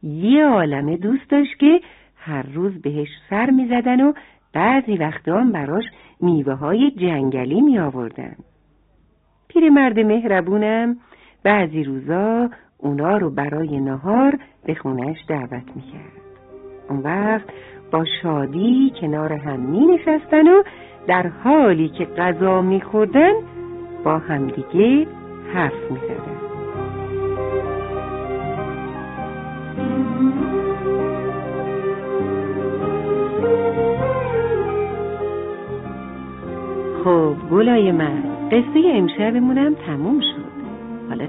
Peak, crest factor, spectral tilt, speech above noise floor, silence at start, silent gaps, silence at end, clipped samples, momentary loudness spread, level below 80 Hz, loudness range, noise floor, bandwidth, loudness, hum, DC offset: 0 dBFS; 18 dB; -10.5 dB/octave; 41 dB; 0.05 s; none; 0 s; under 0.1%; 14 LU; -50 dBFS; 8 LU; -58 dBFS; 4 kHz; -19 LUFS; none; under 0.1%